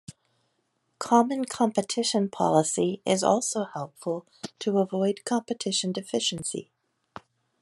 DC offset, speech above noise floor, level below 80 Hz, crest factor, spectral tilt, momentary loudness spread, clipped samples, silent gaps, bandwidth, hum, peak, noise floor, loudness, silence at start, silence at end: under 0.1%; 48 dB; -72 dBFS; 22 dB; -4 dB/octave; 11 LU; under 0.1%; none; 12.5 kHz; none; -6 dBFS; -74 dBFS; -26 LUFS; 0.1 s; 1 s